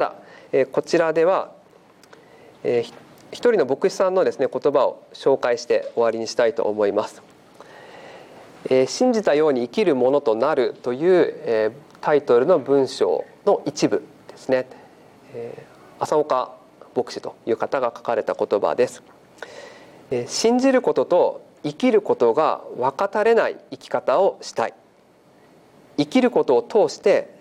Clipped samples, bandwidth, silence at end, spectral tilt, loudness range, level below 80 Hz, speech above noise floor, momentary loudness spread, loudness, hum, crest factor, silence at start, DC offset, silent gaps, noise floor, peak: under 0.1%; 12 kHz; 0.15 s; -5 dB/octave; 5 LU; -70 dBFS; 34 dB; 14 LU; -21 LUFS; none; 14 dB; 0 s; under 0.1%; none; -54 dBFS; -6 dBFS